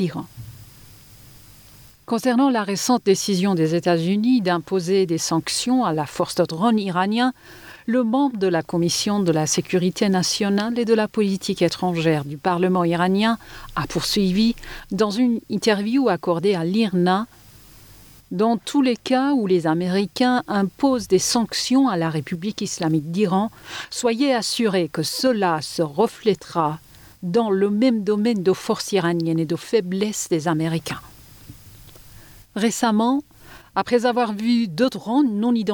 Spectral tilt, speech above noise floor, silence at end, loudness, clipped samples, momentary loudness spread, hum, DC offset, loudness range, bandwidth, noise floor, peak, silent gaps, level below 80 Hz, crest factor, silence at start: -5 dB/octave; 27 dB; 0 s; -21 LUFS; under 0.1%; 7 LU; none; under 0.1%; 3 LU; over 20 kHz; -47 dBFS; -6 dBFS; none; -54 dBFS; 14 dB; 0 s